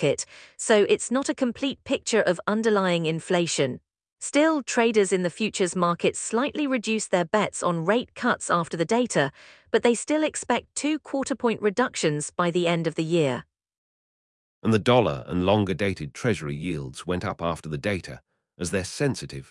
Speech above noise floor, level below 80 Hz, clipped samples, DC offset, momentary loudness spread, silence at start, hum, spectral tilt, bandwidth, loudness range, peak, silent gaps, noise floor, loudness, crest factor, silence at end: over 66 dB; -58 dBFS; under 0.1%; under 0.1%; 8 LU; 0 s; none; -4.5 dB/octave; 12 kHz; 3 LU; -6 dBFS; 13.78-14.62 s; under -90 dBFS; -25 LUFS; 20 dB; 0.1 s